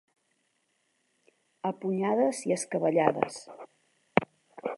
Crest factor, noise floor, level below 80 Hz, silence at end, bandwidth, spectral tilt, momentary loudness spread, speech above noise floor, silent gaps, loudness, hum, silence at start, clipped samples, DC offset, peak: 30 dB; -75 dBFS; -70 dBFS; 0 s; 11.5 kHz; -5.5 dB/octave; 19 LU; 46 dB; none; -29 LUFS; none; 1.65 s; under 0.1%; under 0.1%; -2 dBFS